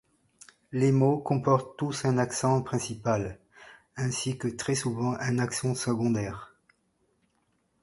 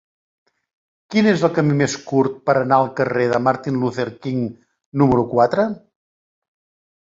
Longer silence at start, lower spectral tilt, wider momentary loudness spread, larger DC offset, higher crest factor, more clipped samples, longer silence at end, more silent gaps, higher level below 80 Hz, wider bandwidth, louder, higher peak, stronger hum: second, 0.7 s vs 1.1 s; about the same, -5.5 dB/octave vs -6.5 dB/octave; about the same, 10 LU vs 8 LU; neither; about the same, 20 dB vs 18 dB; neither; about the same, 1.35 s vs 1.25 s; second, none vs 4.86-4.92 s; second, -58 dBFS vs -52 dBFS; first, 11.5 kHz vs 8 kHz; second, -28 LUFS vs -19 LUFS; second, -8 dBFS vs -2 dBFS; neither